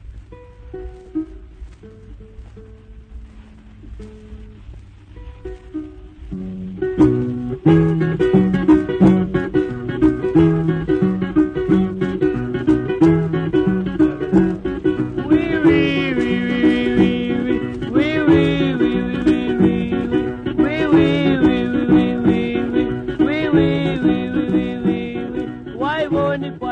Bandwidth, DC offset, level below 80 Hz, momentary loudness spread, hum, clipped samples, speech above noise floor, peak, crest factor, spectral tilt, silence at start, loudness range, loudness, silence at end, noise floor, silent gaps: 6.6 kHz; under 0.1%; -38 dBFS; 14 LU; none; under 0.1%; 10 dB; 0 dBFS; 18 dB; -8.5 dB/octave; 0.05 s; 17 LU; -17 LUFS; 0 s; -41 dBFS; none